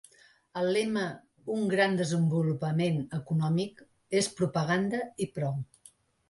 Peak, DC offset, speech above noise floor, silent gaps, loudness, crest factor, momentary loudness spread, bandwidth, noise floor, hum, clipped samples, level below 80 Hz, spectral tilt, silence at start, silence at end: -14 dBFS; under 0.1%; 31 dB; none; -30 LUFS; 18 dB; 10 LU; 11.5 kHz; -60 dBFS; none; under 0.1%; -66 dBFS; -6 dB/octave; 0.55 s; 0.65 s